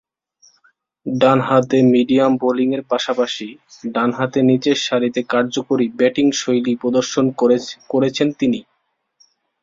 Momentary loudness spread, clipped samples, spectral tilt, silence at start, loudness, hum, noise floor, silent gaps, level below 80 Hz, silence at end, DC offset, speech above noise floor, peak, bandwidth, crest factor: 8 LU; under 0.1%; -5.5 dB/octave; 1.05 s; -17 LUFS; none; -65 dBFS; none; -60 dBFS; 1 s; under 0.1%; 49 dB; -2 dBFS; 7.6 kHz; 16 dB